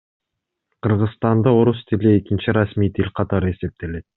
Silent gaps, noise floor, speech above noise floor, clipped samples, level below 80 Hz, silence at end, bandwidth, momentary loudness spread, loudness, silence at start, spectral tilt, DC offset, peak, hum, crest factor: none; -80 dBFS; 62 dB; under 0.1%; -48 dBFS; 0.15 s; 4.1 kHz; 10 LU; -19 LUFS; 0.85 s; -7.5 dB/octave; under 0.1%; -2 dBFS; none; 16 dB